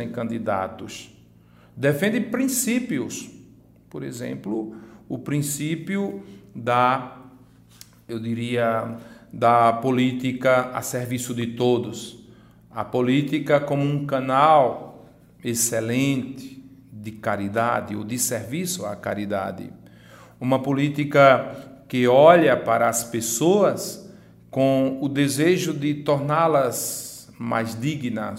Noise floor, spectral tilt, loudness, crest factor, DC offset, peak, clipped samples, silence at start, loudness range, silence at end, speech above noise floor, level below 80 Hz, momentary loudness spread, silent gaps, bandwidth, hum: -52 dBFS; -5 dB/octave; -22 LUFS; 22 dB; under 0.1%; 0 dBFS; under 0.1%; 0 s; 8 LU; 0 s; 30 dB; -62 dBFS; 18 LU; none; 16 kHz; none